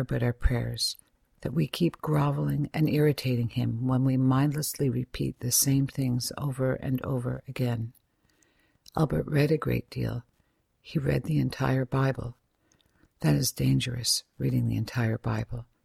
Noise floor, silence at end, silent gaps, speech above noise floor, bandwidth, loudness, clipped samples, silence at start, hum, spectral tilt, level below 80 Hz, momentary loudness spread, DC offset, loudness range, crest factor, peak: -71 dBFS; 0.2 s; none; 44 dB; 16.5 kHz; -28 LUFS; under 0.1%; 0 s; none; -5.5 dB/octave; -44 dBFS; 9 LU; under 0.1%; 4 LU; 18 dB; -10 dBFS